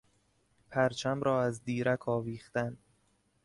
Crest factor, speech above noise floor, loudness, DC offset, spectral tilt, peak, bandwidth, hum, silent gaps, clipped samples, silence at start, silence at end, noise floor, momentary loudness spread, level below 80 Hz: 18 dB; 40 dB; -33 LUFS; under 0.1%; -6 dB/octave; -16 dBFS; 11.5 kHz; none; none; under 0.1%; 0.7 s; 0.7 s; -72 dBFS; 7 LU; -66 dBFS